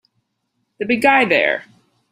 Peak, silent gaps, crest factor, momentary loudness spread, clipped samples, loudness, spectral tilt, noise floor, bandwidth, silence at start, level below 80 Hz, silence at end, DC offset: -2 dBFS; none; 18 dB; 12 LU; under 0.1%; -15 LUFS; -4.5 dB/octave; -71 dBFS; 16 kHz; 0.8 s; -62 dBFS; 0.5 s; under 0.1%